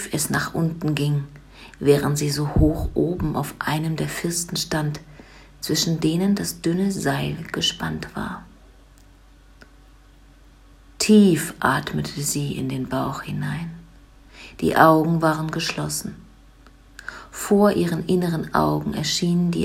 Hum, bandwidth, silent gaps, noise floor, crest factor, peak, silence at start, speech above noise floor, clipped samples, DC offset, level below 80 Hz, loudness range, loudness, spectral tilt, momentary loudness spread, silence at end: none; 16 kHz; none; -50 dBFS; 22 dB; 0 dBFS; 0 s; 28 dB; under 0.1%; under 0.1%; -40 dBFS; 5 LU; -22 LUFS; -5 dB/octave; 14 LU; 0 s